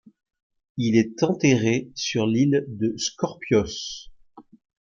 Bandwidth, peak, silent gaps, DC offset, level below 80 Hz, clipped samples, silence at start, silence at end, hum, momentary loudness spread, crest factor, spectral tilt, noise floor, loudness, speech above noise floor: 7.4 kHz; -6 dBFS; none; under 0.1%; -56 dBFS; under 0.1%; 0.75 s; 0.55 s; none; 11 LU; 18 dB; -5.5 dB/octave; -50 dBFS; -23 LUFS; 28 dB